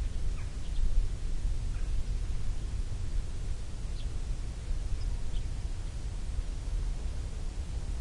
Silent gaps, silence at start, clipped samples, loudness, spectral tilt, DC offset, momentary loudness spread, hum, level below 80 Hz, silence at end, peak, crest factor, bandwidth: none; 0 s; under 0.1%; -39 LUFS; -5.5 dB/octave; under 0.1%; 3 LU; none; -32 dBFS; 0 s; -16 dBFS; 14 dB; 11 kHz